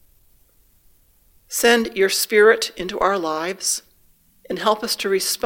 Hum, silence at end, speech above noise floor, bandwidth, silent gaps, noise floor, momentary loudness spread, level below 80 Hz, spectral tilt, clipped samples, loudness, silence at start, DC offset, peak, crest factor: none; 0.1 s; 37 dB; 17 kHz; none; -57 dBFS; 11 LU; -54 dBFS; -1.5 dB/octave; under 0.1%; -19 LUFS; 1.5 s; under 0.1%; 0 dBFS; 20 dB